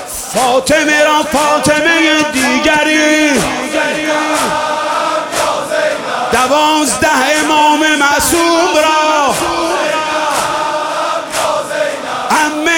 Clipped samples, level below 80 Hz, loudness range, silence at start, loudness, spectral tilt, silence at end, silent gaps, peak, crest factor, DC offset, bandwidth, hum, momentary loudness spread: under 0.1%; -44 dBFS; 4 LU; 0 s; -11 LUFS; -2 dB/octave; 0 s; none; 0 dBFS; 12 dB; under 0.1%; 18 kHz; none; 6 LU